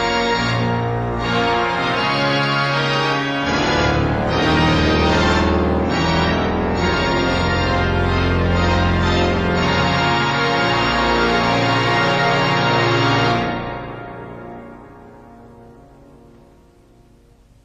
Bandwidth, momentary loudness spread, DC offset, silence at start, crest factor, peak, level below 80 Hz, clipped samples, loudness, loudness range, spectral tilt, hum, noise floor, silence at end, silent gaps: 9.2 kHz; 5 LU; under 0.1%; 0 s; 12 dB; -6 dBFS; -30 dBFS; under 0.1%; -17 LUFS; 4 LU; -5.5 dB/octave; none; -50 dBFS; 1.95 s; none